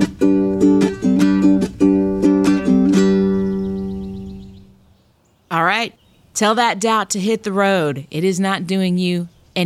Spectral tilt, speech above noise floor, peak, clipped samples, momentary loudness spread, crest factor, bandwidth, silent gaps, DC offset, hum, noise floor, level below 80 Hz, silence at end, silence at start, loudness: -5.5 dB/octave; 39 dB; -2 dBFS; under 0.1%; 11 LU; 14 dB; 13.5 kHz; none; under 0.1%; none; -57 dBFS; -44 dBFS; 0 s; 0 s; -17 LUFS